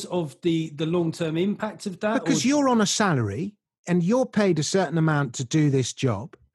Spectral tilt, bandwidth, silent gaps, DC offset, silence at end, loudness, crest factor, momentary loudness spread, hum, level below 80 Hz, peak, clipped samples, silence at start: -5.5 dB/octave; 12.5 kHz; 3.78-3.84 s; under 0.1%; 0.25 s; -24 LUFS; 18 dB; 9 LU; none; -66 dBFS; -6 dBFS; under 0.1%; 0 s